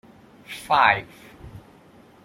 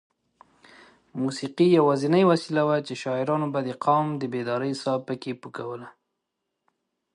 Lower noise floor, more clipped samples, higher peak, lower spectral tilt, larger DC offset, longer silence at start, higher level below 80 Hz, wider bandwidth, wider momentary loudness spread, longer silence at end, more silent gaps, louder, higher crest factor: second, -51 dBFS vs -81 dBFS; neither; first, -2 dBFS vs -8 dBFS; second, -3.5 dB/octave vs -6.5 dB/octave; neither; second, 0.5 s vs 1.15 s; first, -54 dBFS vs -74 dBFS; first, 16.5 kHz vs 11 kHz; first, 26 LU vs 15 LU; second, 0.65 s vs 1.25 s; neither; first, -20 LUFS vs -25 LUFS; first, 24 dB vs 18 dB